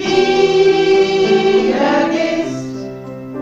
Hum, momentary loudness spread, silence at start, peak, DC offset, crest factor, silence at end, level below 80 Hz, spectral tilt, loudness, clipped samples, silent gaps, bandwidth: none; 16 LU; 0 s; -2 dBFS; under 0.1%; 12 dB; 0 s; -46 dBFS; -5 dB/octave; -13 LUFS; under 0.1%; none; 7.8 kHz